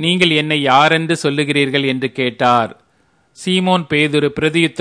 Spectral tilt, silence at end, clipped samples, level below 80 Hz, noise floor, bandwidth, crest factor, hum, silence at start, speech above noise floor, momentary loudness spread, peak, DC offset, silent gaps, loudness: -5 dB/octave; 0 s; under 0.1%; -54 dBFS; -58 dBFS; 11 kHz; 16 dB; none; 0 s; 43 dB; 7 LU; 0 dBFS; under 0.1%; none; -15 LUFS